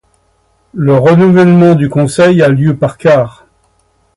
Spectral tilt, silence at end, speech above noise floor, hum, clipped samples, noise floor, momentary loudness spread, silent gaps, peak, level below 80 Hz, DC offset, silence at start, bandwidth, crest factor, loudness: -7.5 dB/octave; 0.85 s; 47 dB; none; under 0.1%; -54 dBFS; 7 LU; none; 0 dBFS; -44 dBFS; under 0.1%; 0.75 s; 11.5 kHz; 10 dB; -8 LUFS